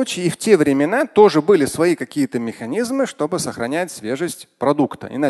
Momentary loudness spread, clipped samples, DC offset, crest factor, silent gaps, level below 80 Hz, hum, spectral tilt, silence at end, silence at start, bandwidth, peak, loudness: 11 LU; under 0.1%; under 0.1%; 18 dB; none; -58 dBFS; none; -5 dB/octave; 0 s; 0 s; 12.5 kHz; 0 dBFS; -18 LUFS